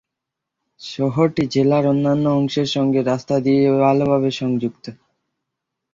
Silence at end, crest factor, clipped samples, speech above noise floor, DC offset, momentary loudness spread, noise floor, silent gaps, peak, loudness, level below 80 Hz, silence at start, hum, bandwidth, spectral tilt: 1 s; 16 dB; under 0.1%; 65 dB; under 0.1%; 11 LU; -82 dBFS; none; -4 dBFS; -18 LUFS; -56 dBFS; 0.8 s; none; 7.6 kHz; -7 dB/octave